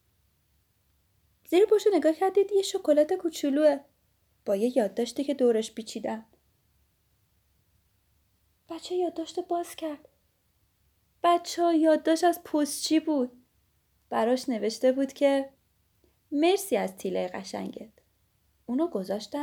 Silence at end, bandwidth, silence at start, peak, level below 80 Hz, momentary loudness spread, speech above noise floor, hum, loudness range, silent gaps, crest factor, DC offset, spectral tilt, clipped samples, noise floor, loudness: 0 s; over 20 kHz; 1.5 s; -12 dBFS; -72 dBFS; 13 LU; 44 dB; none; 11 LU; none; 18 dB; under 0.1%; -4 dB/octave; under 0.1%; -71 dBFS; -27 LUFS